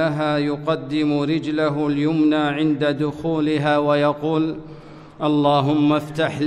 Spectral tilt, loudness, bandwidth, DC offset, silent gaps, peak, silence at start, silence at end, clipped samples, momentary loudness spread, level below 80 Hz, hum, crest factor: -7.5 dB/octave; -20 LUFS; 9.4 kHz; under 0.1%; none; -4 dBFS; 0 s; 0 s; under 0.1%; 6 LU; -54 dBFS; none; 16 dB